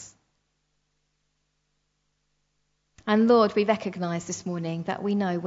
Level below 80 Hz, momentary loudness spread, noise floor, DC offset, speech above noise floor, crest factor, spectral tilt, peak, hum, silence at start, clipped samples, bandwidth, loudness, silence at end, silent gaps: -70 dBFS; 12 LU; -75 dBFS; under 0.1%; 51 dB; 20 dB; -6 dB/octave; -8 dBFS; 50 Hz at -55 dBFS; 0 s; under 0.1%; 7.8 kHz; -25 LUFS; 0 s; none